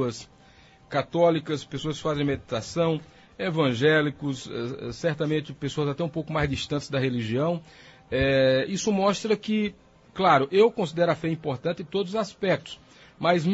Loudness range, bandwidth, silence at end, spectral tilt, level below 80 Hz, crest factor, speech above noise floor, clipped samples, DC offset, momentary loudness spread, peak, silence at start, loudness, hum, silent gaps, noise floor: 4 LU; 8 kHz; 0 s; -5.5 dB/octave; -52 dBFS; 18 dB; 29 dB; under 0.1%; under 0.1%; 11 LU; -8 dBFS; 0 s; -26 LUFS; none; none; -54 dBFS